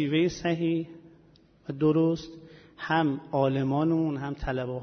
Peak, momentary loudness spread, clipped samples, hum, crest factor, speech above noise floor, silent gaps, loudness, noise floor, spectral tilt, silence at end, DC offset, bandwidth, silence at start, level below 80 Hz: -12 dBFS; 15 LU; under 0.1%; none; 16 dB; 32 dB; none; -27 LUFS; -58 dBFS; -7 dB/octave; 0 s; under 0.1%; 6.6 kHz; 0 s; -50 dBFS